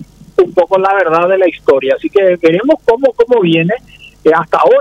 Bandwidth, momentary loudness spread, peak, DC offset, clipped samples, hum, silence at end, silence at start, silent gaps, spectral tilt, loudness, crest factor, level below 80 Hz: 8.4 kHz; 4 LU; 0 dBFS; under 0.1%; under 0.1%; none; 0 s; 0 s; none; -7 dB/octave; -11 LUFS; 10 dB; -48 dBFS